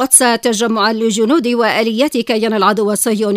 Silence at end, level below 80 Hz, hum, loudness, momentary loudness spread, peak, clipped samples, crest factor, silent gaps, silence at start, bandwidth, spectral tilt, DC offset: 0 s; -60 dBFS; none; -13 LUFS; 4 LU; 0 dBFS; under 0.1%; 14 dB; none; 0 s; 16 kHz; -2.5 dB/octave; under 0.1%